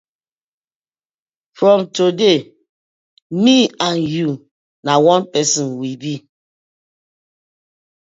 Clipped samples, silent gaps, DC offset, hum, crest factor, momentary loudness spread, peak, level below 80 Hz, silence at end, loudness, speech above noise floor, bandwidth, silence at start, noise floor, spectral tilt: under 0.1%; 2.69-3.30 s, 4.51-4.83 s; under 0.1%; none; 18 dB; 14 LU; 0 dBFS; -64 dBFS; 1.95 s; -15 LUFS; over 75 dB; 7.8 kHz; 1.6 s; under -90 dBFS; -4 dB/octave